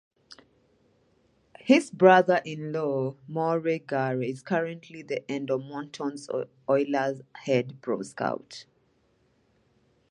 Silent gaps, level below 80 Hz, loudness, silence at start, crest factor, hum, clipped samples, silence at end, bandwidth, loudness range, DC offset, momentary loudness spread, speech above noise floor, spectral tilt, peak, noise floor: none; -76 dBFS; -27 LUFS; 0.3 s; 22 dB; none; under 0.1%; 1.5 s; 11 kHz; 6 LU; under 0.1%; 15 LU; 41 dB; -6 dB/octave; -4 dBFS; -67 dBFS